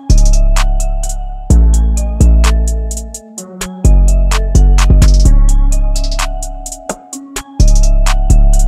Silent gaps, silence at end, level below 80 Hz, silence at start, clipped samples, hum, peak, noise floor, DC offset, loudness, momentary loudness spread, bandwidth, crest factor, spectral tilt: none; 0 s; -8 dBFS; 0.05 s; under 0.1%; none; 0 dBFS; -28 dBFS; 0.4%; -13 LUFS; 14 LU; 13 kHz; 8 dB; -5 dB/octave